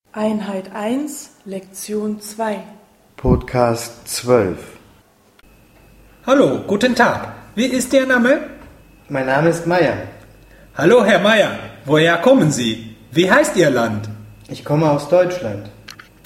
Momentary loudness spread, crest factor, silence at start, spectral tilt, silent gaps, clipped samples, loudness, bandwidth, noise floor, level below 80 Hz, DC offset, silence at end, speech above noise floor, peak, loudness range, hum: 18 LU; 18 dB; 0.15 s; -5 dB/octave; none; under 0.1%; -16 LUFS; 16 kHz; -52 dBFS; -40 dBFS; under 0.1%; 0.35 s; 36 dB; 0 dBFS; 7 LU; none